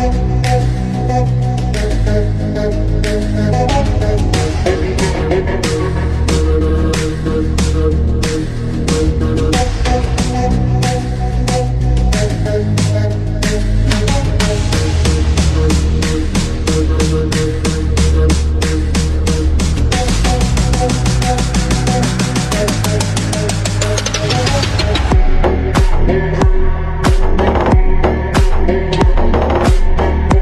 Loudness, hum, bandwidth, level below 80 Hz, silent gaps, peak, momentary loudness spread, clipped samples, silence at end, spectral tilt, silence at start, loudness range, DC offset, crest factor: -15 LUFS; none; 13 kHz; -16 dBFS; none; 0 dBFS; 3 LU; under 0.1%; 0 s; -5.5 dB/octave; 0 s; 1 LU; under 0.1%; 12 dB